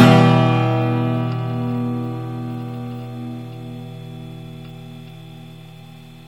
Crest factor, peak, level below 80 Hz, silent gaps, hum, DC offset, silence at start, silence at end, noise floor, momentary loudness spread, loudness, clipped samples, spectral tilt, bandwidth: 20 dB; 0 dBFS; -56 dBFS; none; none; 0.3%; 0 s; 0 s; -40 dBFS; 23 LU; -20 LUFS; under 0.1%; -7.5 dB/octave; 13 kHz